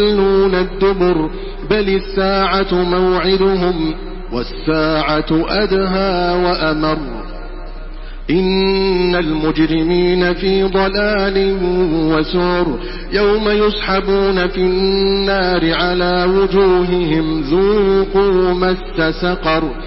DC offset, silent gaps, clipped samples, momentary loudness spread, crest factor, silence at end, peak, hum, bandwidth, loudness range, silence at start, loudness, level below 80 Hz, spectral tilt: under 0.1%; none; under 0.1%; 8 LU; 14 dB; 0 s; -2 dBFS; none; 5.8 kHz; 3 LU; 0 s; -15 LUFS; -28 dBFS; -10.5 dB/octave